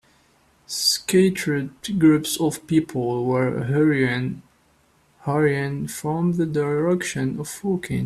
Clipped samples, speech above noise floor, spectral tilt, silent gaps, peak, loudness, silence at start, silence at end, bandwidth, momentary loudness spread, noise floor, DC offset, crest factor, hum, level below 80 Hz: under 0.1%; 39 dB; -5 dB/octave; none; -6 dBFS; -22 LUFS; 0.7 s; 0 s; 14.5 kHz; 9 LU; -60 dBFS; under 0.1%; 16 dB; none; -56 dBFS